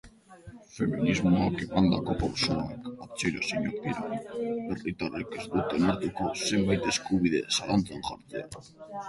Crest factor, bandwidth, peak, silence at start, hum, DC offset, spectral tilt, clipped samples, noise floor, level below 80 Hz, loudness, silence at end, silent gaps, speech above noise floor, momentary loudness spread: 20 dB; 11.5 kHz; -10 dBFS; 0.05 s; none; under 0.1%; -5 dB/octave; under 0.1%; -50 dBFS; -50 dBFS; -29 LUFS; 0 s; none; 21 dB; 13 LU